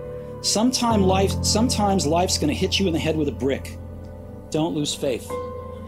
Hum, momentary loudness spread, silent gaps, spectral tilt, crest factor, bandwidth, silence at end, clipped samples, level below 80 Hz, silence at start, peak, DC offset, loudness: none; 16 LU; none; -4.5 dB/octave; 16 dB; 16 kHz; 0 s; under 0.1%; -44 dBFS; 0 s; -6 dBFS; 0.1%; -22 LUFS